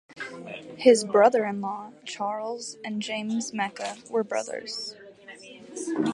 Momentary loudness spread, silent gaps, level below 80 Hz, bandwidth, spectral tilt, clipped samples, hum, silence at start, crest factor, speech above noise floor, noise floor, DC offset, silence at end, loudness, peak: 20 LU; none; -76 dBFS; 11.5 kHz; -4 dB/octave; under 0.1%; none; 0.1 s; 22 dB; 21 dB; -47 dBFS; under 0.1%; 0 s; -26 LUFS; -4 dBFS